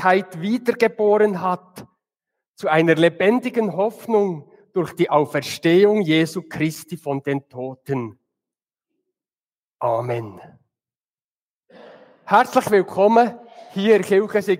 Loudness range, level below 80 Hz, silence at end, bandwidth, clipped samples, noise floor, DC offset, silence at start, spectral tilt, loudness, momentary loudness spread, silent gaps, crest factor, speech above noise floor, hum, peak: 11 LU; -68 dBFS; 0 s; 16 kHz; under 0.1%; under -90 dBFS; under 0.1%; 0 s; -6 dB/octave; -19 LUFS; 12 LU; 2.48-2.54 s, 9.46-9.50 s, 9.59-9.69 s, 10.96-11.14 s, 11.24-11.61 s; 18 dB; over 71 dB; none; -2 dBFS